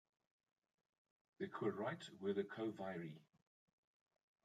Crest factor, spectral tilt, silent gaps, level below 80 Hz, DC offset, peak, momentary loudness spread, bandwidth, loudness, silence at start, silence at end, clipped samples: 20 dB; -6.5 dB/octave; none; under -90 dBFS; under 0.1%; -30 dBFS; 8 LU; 9.2 kHz; -47 LUFS; 1.4 s; 1.25 s; under 0.1%